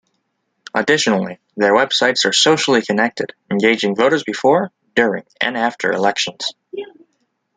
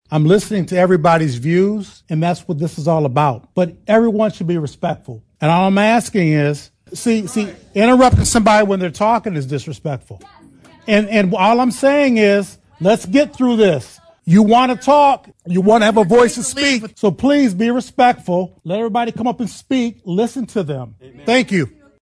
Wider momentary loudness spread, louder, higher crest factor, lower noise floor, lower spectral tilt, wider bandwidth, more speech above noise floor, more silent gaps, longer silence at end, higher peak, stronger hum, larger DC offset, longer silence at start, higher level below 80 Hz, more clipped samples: about the same, 12 LU vs 12 LU; about the same, -16 LUFS vs -15 LUFS; about the same, 16 dB vs 14 dB; first, -70 dBFS vs -45 dBFS; second, -3 dB/octave vs -5.5 dB/octave; second, 9.6 kHz vs 11 kHz; first, 54 dB vs 30 dB; neither; first, 0.7 s vs 0.35 s; about the same, -2 dBFS vs -2 dBFS; neither; neither; first, 0.75 s vs 0.1 s; second, -64 dBFS vs -40 dBFS; neither